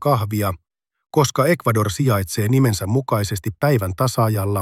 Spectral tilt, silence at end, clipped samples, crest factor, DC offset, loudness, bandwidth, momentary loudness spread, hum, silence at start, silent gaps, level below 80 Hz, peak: -6 dB/octave; 0 s; under 0.1%; 16 dB; under 0.1%; -19 LUFS; 16.5 kHz; 6 LU; none; 0 s; none; -50 dBFS; -2 dBFS